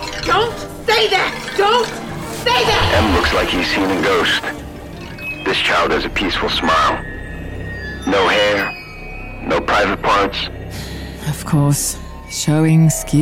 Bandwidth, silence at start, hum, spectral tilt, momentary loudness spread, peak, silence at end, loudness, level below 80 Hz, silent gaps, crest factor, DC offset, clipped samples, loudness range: 16.5 kHz; 0 s; none; -4 dB/octave; 15 LU; -2 dBFS; 0 s; -16 LUFS; -32 dBFS; none; 14 dB; under 0.1%; under 0.1%; 3 LU